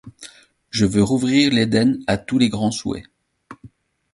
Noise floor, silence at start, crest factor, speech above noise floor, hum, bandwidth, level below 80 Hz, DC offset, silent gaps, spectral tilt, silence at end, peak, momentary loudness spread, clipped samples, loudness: -48 dBFS; 0.05 s; 18 dB; 30 dB; none; 11.5 kHz; -46 dBFS; under 0.1%; none; -5 dB/octave; 0.45 s; -2 dBFS; 12 LU; under 0.1%; -19 LUFS